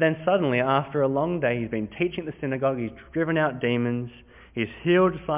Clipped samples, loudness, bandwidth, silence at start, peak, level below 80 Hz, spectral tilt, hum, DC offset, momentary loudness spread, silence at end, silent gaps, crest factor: under 0.1%; -25 LUFS; 3.8 kHz; 0 s; -8 dBFS; -54 dBFS; -10.5 dB/octave; none; under 0.1%; 10 LU; 0 s; none; 16 dB